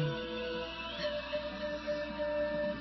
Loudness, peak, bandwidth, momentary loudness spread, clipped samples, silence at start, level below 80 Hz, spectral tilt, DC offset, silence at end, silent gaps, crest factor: -37 LUFS; -24 dBFS; 6 kHz; 4 LU; under 0.1%; 0 s; -56 dBFS; -3.5 dB/octave; under 0.1%; 0 s; none; 12 dB